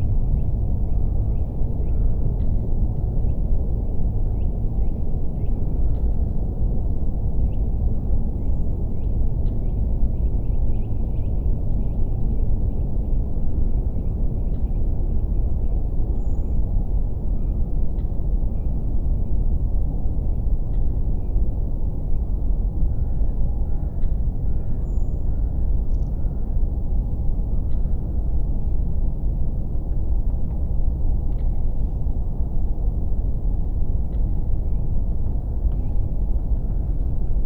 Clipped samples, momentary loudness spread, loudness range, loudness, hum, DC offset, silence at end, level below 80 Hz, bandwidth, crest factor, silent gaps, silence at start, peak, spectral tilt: under 0.1%; 2 LU; 1 LU; -26 LUFS; none; under 0.1%; 0 s; -20 dBFS; 1.2 kHz; 12 dB; none; 0 s; -8 dBFS; -12 dB/octave